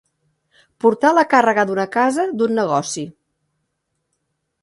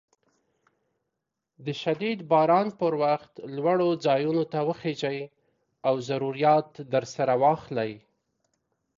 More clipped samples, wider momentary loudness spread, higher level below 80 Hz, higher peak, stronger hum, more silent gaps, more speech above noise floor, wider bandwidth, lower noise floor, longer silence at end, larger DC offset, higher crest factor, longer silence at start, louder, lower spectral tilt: neither; about the same, 10 LU vs 9 LU; about the same, -68 dBFS vs -72 dBFS; first, 0 dBFS vs -10 dBFS; neither; neither; about the same, 57 dB vs 58 dB; first, 11.5 kHz vs 7.6 kHz; second, -73 dBFS vs -84 dBFS; first, 1.5 s vs 1 s; neither; about the same, 18 dB vs 18 dB; second, 0.85 s vs 1.6 s; first, -17 LUFS vs -26 LUFS; second, -4.5 dB/octave vs -6.5 dB/octave